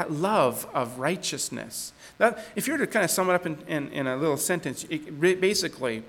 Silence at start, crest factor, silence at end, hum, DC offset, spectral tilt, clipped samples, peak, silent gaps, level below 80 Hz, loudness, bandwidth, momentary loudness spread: 0 s; 20 dB; 0 s; none; under 0.1%; -3.5 dB/octave; under 0.1%; -8 dBFS; none; -64 dBFS; -26 LUFS; 19 kHz; 9 LU